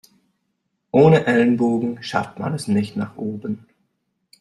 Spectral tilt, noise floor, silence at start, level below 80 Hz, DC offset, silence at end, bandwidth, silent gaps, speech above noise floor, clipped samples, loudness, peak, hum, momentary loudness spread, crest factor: -7 dB/octave; -73 dBFS; 0.95 s; -60 dBFS; under 0.1%; 0.85 s; 12.5 kHz; none; 55 dB; under 0.1%; -19 LUFS; -2 dBFS; none; 15 LU; 18 dB